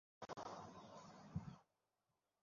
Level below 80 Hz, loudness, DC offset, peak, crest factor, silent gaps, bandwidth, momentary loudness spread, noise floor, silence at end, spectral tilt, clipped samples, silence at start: -72 dBFS; -55 LUFS; under 0.1%; -34 dBFS; 22 dB; none; 7.2 kHz; 7 LU; under -90 dBFS; 0.8 s; -6 dB/octave; under 0.1%; 0.2 s